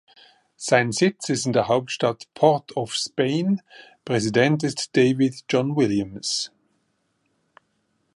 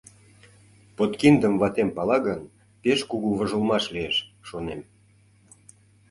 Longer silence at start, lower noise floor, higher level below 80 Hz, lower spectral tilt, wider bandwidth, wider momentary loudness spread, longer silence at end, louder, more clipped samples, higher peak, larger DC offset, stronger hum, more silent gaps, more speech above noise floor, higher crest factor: second, 0.6 s vs 1 s; first, -71 dBFS vs -58 dBFS; second, -62 dBFS vs -56 dBFS; about the same, -5 dB/octave vs -5.5 dB/octave; about the same, 11.5 kHz vs 11.5 kHz; second, 7 LU vs 16 LU; first, 1.7 s vs 1.3 s; about the same, -22 LUFS vs -24 LUFS; neither; about the same, -2 dBFS vs -4 dBFS; neither; neither; neither; first, 49 dB vs 35 dB; about the same, 20 dB vs 22 dB